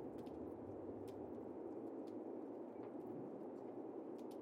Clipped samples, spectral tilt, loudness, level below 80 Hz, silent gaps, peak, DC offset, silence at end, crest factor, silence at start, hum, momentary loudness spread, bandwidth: under 0.1%; -8.5 dB/octave; -51 LUFS; -78 dBFS; none; -40 dBFS; under 0.1%; 0 s; 12 dB; 0 s; none; 1 LU; 16 kHz